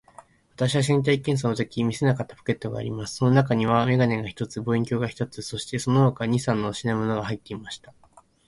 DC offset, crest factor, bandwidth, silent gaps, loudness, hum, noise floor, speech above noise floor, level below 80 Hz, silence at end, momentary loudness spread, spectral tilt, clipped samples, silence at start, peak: under 0.1%; 18 dB; 11.5 kHz; none; -24 LUFS; none; -52 dBFS; 28 dB; -54 dBFS; 0.55 s; 11 LU; -6.5 dB/octave; under 0.1%; 0.6 s; -6 dBFS